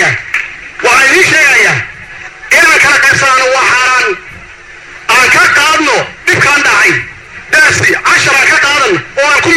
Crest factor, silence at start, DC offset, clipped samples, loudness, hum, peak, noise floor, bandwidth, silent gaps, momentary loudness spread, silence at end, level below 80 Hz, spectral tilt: 8 dB; 0 s; under 0.1%; 0.3%; -6 LUFS; none; 0 dBFS; -31 dBFS; 20 kHz; none; 11 LU; 0 s; -42 dBFS; -2 dB/octave